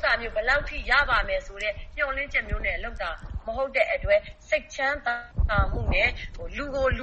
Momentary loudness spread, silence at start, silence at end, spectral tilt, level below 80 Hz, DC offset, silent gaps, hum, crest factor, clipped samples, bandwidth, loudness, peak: 10 LU; 0 s; 0 s; -5 dB/octave; -34 dBFS; under 0.1%; none; none; 18 dB; under 0.1%; 8.4 kHz; -26 LUFS; -8 dBFS